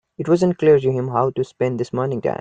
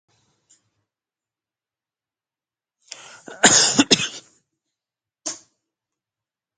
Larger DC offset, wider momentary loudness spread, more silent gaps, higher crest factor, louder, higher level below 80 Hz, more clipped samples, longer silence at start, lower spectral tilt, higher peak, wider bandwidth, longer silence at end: neither; second, 7 LU vs 26 LU; neither; second, 14 dB vs 26 dB; second, -19 LUFS vs -15 LUFS; first, -56 dBFS vs -64 dBFS; neither; second, 0.2 s vs 3.3 s; first, -8 dB/octave vs -1 dB/octave; second, -4 dBFS vs 0 dBFS; second, 9 kHz vs 10 kHz; second, 0.05 s vs 1.2 s